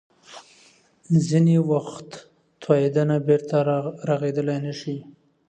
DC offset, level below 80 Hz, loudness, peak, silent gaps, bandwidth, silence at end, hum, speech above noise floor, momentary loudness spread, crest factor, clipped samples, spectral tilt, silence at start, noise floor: under 0.1%; -66 dBFS; -22 LUFS; -6 dBFS; none; 9 kHz; 0.4 s; none; 35 dB; 18 LU; 18 dB; under 0.1%; -8 dB/octave; 0.3 s; -56 dBFS